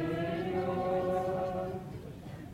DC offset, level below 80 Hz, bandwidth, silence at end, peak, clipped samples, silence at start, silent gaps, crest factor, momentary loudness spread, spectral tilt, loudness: under 0.1%; -56 dBFS; 16 kHz; 0 s; -22 dBFS; under 0.1%; 0 s; none; 14 dB; 13 LU; -7.5 dB/octave; -34 LUFS